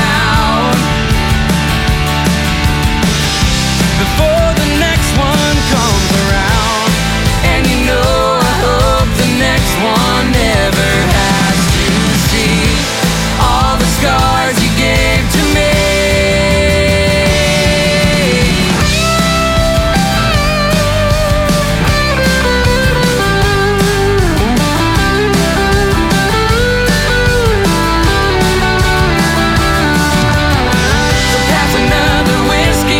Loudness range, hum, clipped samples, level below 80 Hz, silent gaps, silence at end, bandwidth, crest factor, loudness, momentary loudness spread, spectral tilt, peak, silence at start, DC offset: 1 LU; none; under 0.1%; -18 dBFS; none; 0 s; 17 kHz; 10 dB; -11 LUFS; 2 LU; -4.5 dB/octave; 0 dBFS; 0 s; under 0.1%